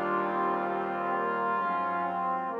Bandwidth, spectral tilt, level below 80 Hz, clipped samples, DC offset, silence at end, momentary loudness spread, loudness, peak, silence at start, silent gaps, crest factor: 6.6 kHz; -8 dB/octave; -72 dBFS; under 0.1%; under 0.1%; 0 s; 2 LU; -30 LUFS; -16 dBFS; 0 s; none; 12 dB